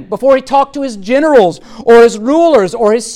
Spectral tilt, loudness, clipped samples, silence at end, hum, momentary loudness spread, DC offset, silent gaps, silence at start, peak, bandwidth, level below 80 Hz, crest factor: -4.5 dB/octave; -9 LUFS; under 0.1%; 0 s; none; 9 LU; under 0.1%; none; 0 s; 0 dBFS; 12 kHz; -44 dBFS; 10 dB